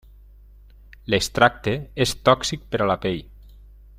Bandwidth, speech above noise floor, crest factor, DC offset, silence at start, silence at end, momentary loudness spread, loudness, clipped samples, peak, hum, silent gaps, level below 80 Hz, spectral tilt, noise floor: 16 kHz; 26 dB; 22 dB; under 0.1%; 1.1 s; 0.5 s; 9 LU; -22 LUFS; under 0.1%; -2 dBFS; 50 Hz at -45 dBFS; none; -44 dBFS; -4.5 dB/octave; -47 dBFS